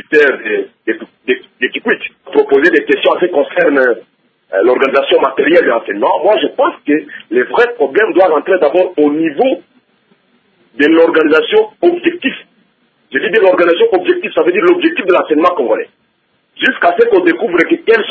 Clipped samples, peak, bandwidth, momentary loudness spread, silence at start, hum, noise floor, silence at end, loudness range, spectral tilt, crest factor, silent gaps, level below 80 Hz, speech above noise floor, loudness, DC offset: 0.2%; 0 dBFS; 8 kHz; 9 LU; 0.1 s; none; -59 dBFS; 0 s; 2 LU; -6 dB/octave; 12 dB; none; -60 dBFS; 48 dB; -12 LUFS; under 0.1%